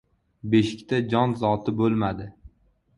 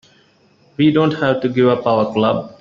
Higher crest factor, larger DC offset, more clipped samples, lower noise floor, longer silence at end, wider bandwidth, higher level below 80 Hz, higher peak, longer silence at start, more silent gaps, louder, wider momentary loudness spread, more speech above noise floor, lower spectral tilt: about the same, 18 dB vs 14 dB; neither; neither; first, -61 dBFS vs -54 dBFS; first, 0.65 s vs 0.1 s; first, 11 kHz vs 7 kHz; about the same, -52 dBFS vs -56 dBFS; second, -6 dBFS vs -2 dBFS; second, 0.45 s vs 0.8 s; neither; second, -24 LUFS vs -16 LUFS; first, 14 LU vs 4 LU; about the same, 38 dB vs 38 dB; about the same, -7.5 dB/octave vs -8 dB/octave